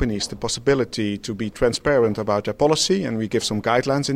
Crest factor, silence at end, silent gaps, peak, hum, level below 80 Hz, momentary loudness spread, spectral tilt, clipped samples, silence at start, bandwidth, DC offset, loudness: 16 dB; 0 s; none; -4 dBFS; none; -42 dBFS; 7 LU; -4.5 dB/octave; under 0.1%; 0 s; 15.5 kHz; under 0.1%; -21 LUFS